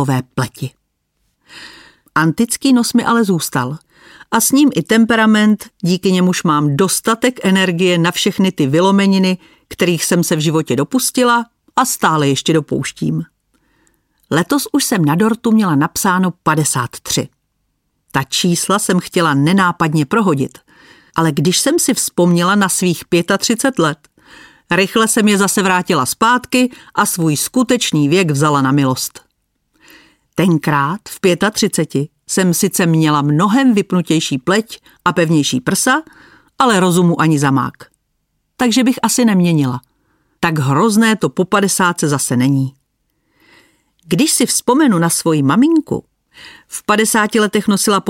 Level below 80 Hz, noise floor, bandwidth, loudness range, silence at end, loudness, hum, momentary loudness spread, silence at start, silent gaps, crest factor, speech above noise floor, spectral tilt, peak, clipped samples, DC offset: -54 dBFS; -67 dBFS; 17 kHz; 3 LU; 0 s; -14 LUFS; none; 8 LU; 0 s; none; 14 dB; 53 dB; -4.5 dB/octave; 0 dBFS; under 0.1%; under 0.1%